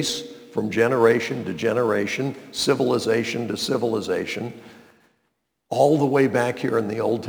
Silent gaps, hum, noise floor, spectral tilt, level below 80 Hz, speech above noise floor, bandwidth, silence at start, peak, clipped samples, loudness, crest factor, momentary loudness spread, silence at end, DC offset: none; none; -73 dBFS; -5 dB/octave; -66 dBFS; 52 dB; over 20 kHz; 0 s; -4 dBFS; under 0.1%; -22 LUFS; 18 dB; 10 LU; 0 s; under 0.1%